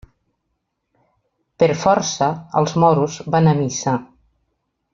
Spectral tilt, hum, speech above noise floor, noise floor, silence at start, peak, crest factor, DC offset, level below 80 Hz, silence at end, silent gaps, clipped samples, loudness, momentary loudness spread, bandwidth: -5.5 dB/octave; none; 57 dB; -74 dBFS; 1.6 s; -2 dBFS; 18 dB; under 0.1%; -54 dBFS; 0.9 s; none; under 0.1%; -18 LUFS; 6 LU; 7.6 kHz